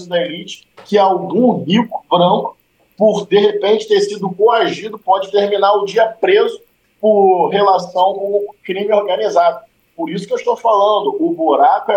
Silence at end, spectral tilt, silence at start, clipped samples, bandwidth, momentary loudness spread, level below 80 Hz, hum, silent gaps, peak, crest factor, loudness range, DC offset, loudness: 0 s; -5.5 dB/octave; 0 s; under 0.1%; 9.2 kHz; 11 LU; -66 dBFS; none; none; -2 dBFS; 14 dB; 2 LU; under 0.1%; -14 LUFS